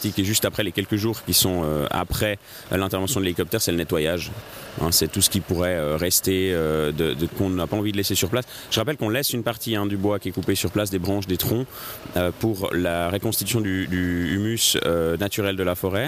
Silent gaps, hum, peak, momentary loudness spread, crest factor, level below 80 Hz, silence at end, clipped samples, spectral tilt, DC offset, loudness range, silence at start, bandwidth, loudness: none; none; -6 dBFS; 6 LU; 18 dB; -44 dBFS; 0 s; under 0.1%; -4 dB/octave; under 0.1%; 3 LU; 0 s; 15.5 kHz; -23 LUFS